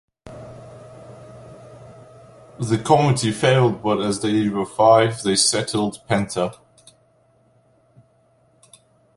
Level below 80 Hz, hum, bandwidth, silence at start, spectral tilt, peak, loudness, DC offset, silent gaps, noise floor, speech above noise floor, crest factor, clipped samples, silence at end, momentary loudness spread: -56 dBFS; none; 11.5 kHz; 0.25 s; -4.5 dB/octave; -2 dBFS; -19 LUFS; under 0.1%; none; -59 dBFS; 41 dB; 20 dB; under 0.1%; 2.6 s; 26 LU